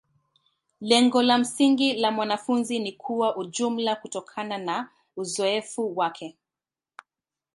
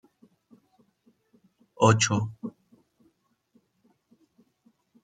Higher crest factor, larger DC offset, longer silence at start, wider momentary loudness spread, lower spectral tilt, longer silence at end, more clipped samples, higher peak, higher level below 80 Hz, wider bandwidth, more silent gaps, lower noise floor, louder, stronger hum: about the same, 22 dB vs 26 dB; neither; second, 0.8 s vs 1.8 s; second, 13 LU vs 21 LU; second, -3 dB/octave vs -4.5 dB/octave; second, 1.25 s vs 2.55 s; neither; about the same, -4 dBFS vs -4 dBFS; second, -76 dBFS vs -66 dBFS; first, 11.5 kHz vs 9.4 kHz; neither; first, under -90 dBFS vs -69 dBFS; about the same, -25 LUFS vs -24 LUFS; neither